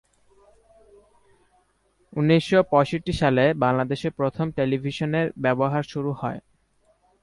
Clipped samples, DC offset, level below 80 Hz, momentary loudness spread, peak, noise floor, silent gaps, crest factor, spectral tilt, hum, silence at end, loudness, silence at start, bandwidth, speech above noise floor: under 0.1%; under 0.1%; -52 dBFS; 10 LU; -4 dBFS; -66 dBFS; none; 20 dB; -7 dB/octave; none; 0.85 s; -23 LUFS; 2.15 s; 11.5 kHz; 43 dB